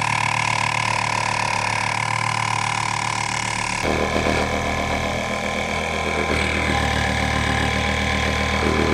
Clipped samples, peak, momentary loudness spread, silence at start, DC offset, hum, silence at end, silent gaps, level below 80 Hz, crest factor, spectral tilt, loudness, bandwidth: under 0.1%; -4 dBFS; 3 LU; 0 s; under 0.1%; none; 0 s; none; -34 dBFS; 18 dB; -4 dB/octave; -21 LUFS; 14 kHz